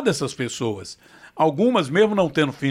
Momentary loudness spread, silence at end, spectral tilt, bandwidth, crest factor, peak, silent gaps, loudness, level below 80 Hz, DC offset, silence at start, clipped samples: 10 LU; 0 s; -5.5 dB/octave; 15 kHz; 16 dB; -6 dBFS; none; -21 LUFS; -60 dBFS; under 0.1%; 0 s; under 0.1%